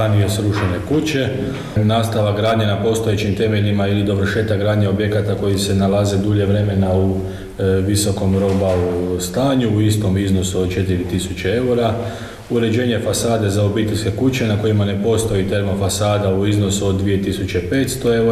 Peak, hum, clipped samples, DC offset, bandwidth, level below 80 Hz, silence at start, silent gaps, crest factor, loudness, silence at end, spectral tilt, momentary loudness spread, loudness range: -4 dBFS; none; under 0.1%; 0.1%; 13.5 kHz; -38 dBFS; 0 s; none; 12 dB; -17 LUFS; 0 s; -6 dB/octave; 4 LU; 1 LU